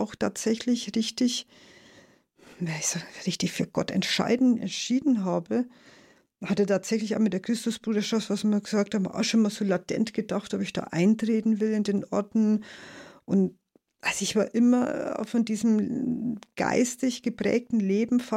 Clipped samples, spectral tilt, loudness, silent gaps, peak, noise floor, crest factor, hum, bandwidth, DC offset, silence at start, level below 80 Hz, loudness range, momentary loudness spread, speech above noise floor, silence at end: under 0.1%; -5 dB/octave; -27 LUFS; none; -10 dBFS; -57 dBFS; 16 dB; none; 14 kHz; under 0.1%; 0 s; -66 dBFS; 2 LU; 7 LU; 31 dB; 0 s